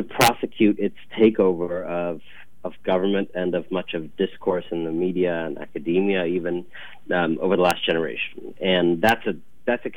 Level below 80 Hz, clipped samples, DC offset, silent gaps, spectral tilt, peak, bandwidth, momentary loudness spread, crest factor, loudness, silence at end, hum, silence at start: -56 dBFS; under 0.1%; 1%; none; -5 dB/octave; -4 dBFS; 16 kHz; 11 LU; 18 dB; -23 LUFS; 0 s; none; 0 s